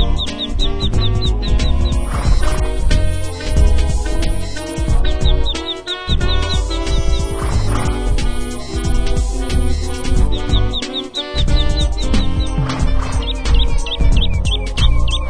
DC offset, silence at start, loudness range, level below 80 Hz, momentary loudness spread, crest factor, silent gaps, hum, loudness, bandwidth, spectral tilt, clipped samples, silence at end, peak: under 0.1%; 0 s; 2 LU; -16 dBFS; 5 LU; 14 dB; none; none; -19 LUFS; 11 kHz; -5 dB/octave; under 0.1%; 0 s; 0 dBFS